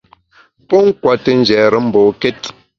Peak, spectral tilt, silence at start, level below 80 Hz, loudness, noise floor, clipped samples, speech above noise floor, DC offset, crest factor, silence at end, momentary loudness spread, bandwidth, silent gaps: 0 dBFS; -6 dB/octave; 0.7 s; -52 dBFS; -12 LUFS; -50 dBFS; under 0.1%; 39 dB; under 0.1%; 14 dB; 0.3 s; 8 LU; 7.4 kHz; none